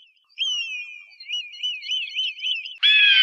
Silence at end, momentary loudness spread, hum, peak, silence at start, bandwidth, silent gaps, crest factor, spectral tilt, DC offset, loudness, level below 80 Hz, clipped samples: 0 s; 16 LU; none; -4 dBFS; 0.4 s; 8.4 kHz; none; 18 dB; 8 dB/octave; under 0.1%; -21 LUFS; -88 dBFS; under 0.1%